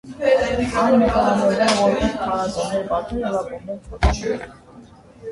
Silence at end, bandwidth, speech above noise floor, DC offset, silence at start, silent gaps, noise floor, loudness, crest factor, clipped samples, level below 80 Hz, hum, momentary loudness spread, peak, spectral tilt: 0 s; 11.5 kHz; 25 dB; under 0.1%; 0.05 s; none; -44 dBFS; -20 LUFS; 18 dB; under 0.1%; -32 dBFS; none; 14 LU; -2 dBFS; -5.5 dB/octave